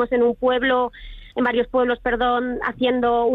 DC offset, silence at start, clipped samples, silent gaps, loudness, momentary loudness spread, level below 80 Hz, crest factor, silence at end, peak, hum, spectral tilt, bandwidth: under 0.1%; 0 s; under 0.1%; none; -21 LUFS; 5 LU; -44 dBFS; 12 dB; 0 s; -8 dBFS; none; -7 dB/octave; 4.1 kHz